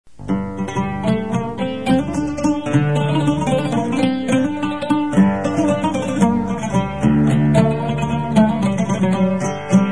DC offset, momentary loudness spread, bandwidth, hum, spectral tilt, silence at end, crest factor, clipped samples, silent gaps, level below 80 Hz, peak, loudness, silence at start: 1%; 7 LU; 10.5 kHz; none; -7 dB/octave; 0 s; 16 dB; under 0.1%; none; -40 dBFS; -2 dBFS; -18 LUFS; 0.05 s